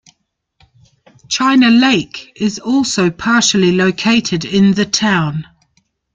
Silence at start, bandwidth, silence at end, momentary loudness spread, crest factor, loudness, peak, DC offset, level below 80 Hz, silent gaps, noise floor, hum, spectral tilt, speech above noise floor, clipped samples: 1.3 s; 9.4 kHz; 0.7 s; 10 LU; 14 dB; -13 LUFS; -2 dBFS; under 0.1%; -50 dBFS; none; -65 dBFS; none; -4 dB/octave; 52 dB; under 0.1%